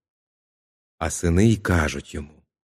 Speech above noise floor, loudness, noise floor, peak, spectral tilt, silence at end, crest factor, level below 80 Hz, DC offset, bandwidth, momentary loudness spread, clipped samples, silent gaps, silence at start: over 69 dB; -22 LUFS; under -90 dBFS; -6 dBFS; -6 dB/octave; 0.35 s; 18 dB; -38 dBFS; under 0.1%; 14.5 kHz; 16 LU; under 0.1%; none; 1 s